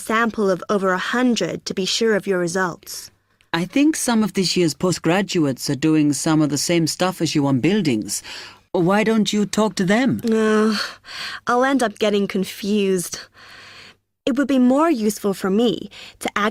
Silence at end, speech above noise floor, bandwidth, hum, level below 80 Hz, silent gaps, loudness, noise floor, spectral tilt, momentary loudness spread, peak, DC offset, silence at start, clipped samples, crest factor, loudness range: 0 s; 28 dB; 16.5 kHz; none; -58 dBFS; none; -19 LUFS; -47 dBFS; -4.5 dB/octave; 10 LU; -2 dBFS; under 0.1%; 0 s; under 0.1%; 16 dB; 2 LU